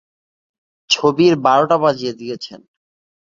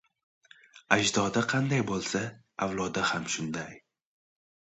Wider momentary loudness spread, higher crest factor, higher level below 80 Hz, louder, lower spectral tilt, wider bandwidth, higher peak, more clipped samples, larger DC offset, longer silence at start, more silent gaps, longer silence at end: first, 16 LU vs 11 LU; second, 16 dB vs 26 dB; about the same, -60 dBFS vs -62 dBFS; first, -15 LUFS vs -29 LUFS; about the same, -4.5 dB/octave vs -4 dB/octave; second, 7.6 kHz vs 8.8 kHz; about the same, -2 dBFS vs -4 dBFS; neither; neither; first, 0.9 s vs 0.75 s; neither; second, 0.7 s vs 0.9 s